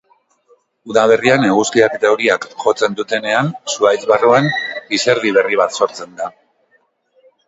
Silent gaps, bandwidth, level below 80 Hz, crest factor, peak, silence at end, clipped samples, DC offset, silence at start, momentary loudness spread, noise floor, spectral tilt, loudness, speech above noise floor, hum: none; 8 kHz; -60 dBFS; 16 dB; 0 dBFS; 1.15 s; under 0.1%; under 0.1%; 0.85 s; 8 LU; -60 dBFS; -4 dB/octave; -14 LUFS; 45 dB; none